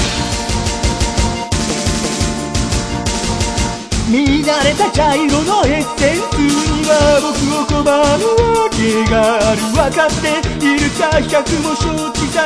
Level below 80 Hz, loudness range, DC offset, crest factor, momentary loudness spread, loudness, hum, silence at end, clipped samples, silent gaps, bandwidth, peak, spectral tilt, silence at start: -26 dBFS; 4 LU; under 0.1%; 14 dB; 6 LU; -14 LUFS; none; 0 s; under 0.1%; none; 11 kHz; 0 dBFS; -4.5 dB/octave; 0 s